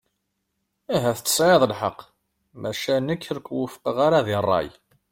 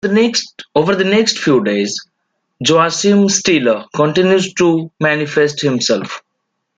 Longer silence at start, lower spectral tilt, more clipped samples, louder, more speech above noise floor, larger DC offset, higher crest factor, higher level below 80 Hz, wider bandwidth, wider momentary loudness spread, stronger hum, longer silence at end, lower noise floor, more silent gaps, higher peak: first, 0.9 s vs 0.05 s; about the same, -4 dB/octave vs -4 dB/octave; neither; second, -22 LUFS vs -14 LUFS; second, 54 dB vs 58 dB; neither; first, 20 dB vs 14 dB; about the same, -58 dBFS vs -56 dBFS; first, 16.5 kHz vs 9.4 kHz; first, 12 LU vs 7 LU; neither; second, 0.4 s vs 0.6 s; first, -76 dBFS vs -72 dBFS; neither; second, -4 dBFS vs 0 dBFS